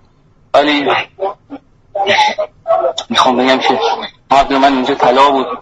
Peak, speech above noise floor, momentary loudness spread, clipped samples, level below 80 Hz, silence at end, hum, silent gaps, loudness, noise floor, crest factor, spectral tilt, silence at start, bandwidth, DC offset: 0 dBFS; 36 dB; 12 LU; under 0.1%; -44 dBFS; 0 s; none; none; -12 LUFS; -49 dBFS; 14 dB; -3.5 dB/octave; 0.55 s; 11 kHz; under 0.1%